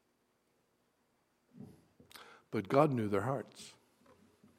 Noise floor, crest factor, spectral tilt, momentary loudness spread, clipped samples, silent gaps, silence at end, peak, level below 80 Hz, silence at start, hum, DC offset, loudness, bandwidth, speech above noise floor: -77 dBFS; 24 dB; -7 dB/octave; 26 LU; under 0.1%; none; 0.9 s; -14 dBFS; -82 dBFS; 1.6 s; none; under 0.1%; -34 LUFS; 15.5 kHz; 44 dB